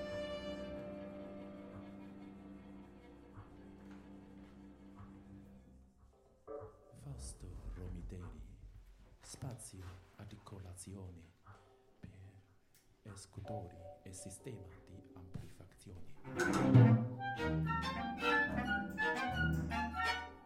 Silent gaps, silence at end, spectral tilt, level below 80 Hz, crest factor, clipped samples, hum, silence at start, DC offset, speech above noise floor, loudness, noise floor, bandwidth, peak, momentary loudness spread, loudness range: none; 0 s; -6 dB/octave; -56 dBFS; 26 dB; under 0.1%; none; 0 s; under 0.1%; 31 dB; -37 LUFS; -69 dBFS; 12.5 kHz; -14 dBFS; 23 LU; 22 LU